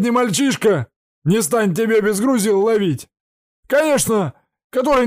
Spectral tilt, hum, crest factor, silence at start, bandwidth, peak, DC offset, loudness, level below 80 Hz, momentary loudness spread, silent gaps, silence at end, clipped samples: -5 dB/octave; none; 12 dB; 0 s; 15.5 kHz; -6 dBFS; under 0.1%; -17 LUFS; -50 dBFS; 9 LU; 0.96-1.22 s, 3.20-3.63 s, 4.64-4.70 s; 0 s; under 0.1%